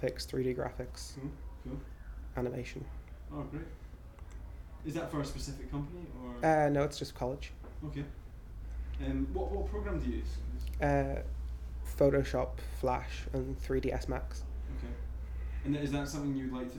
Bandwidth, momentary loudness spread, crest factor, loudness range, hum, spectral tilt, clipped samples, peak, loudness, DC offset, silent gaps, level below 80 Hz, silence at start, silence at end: 19 kHz; 16 LU; 20 dB; 9 LU; none; -6.5 dB/octave; under 0.1%; -16 dBFS; -37 LUFS; under 0.1%; none; -42 dBFS; 0 s; 0 s